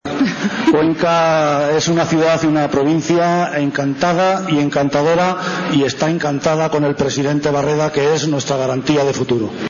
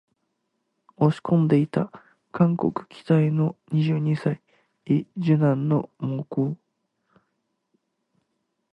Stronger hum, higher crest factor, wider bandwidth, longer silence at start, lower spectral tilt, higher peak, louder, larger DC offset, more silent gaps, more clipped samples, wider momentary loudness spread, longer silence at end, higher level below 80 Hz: neither; second, 10 dB vs 18 dB; first, 7.4 kHz vs 5.6 kHz; second, 0.05 s vs 1 s; second, -5.5 dB/octave vs -10 dB/octave; about the same, -6 dBFS vs -6 dBFS; first, -16 LUFS vs -24 LUFS; neither; neither; neither; second, 4 LU vs 10 LU; second, 0 s vs 2.2 s; first, -48 dBFS vs -66 dBFS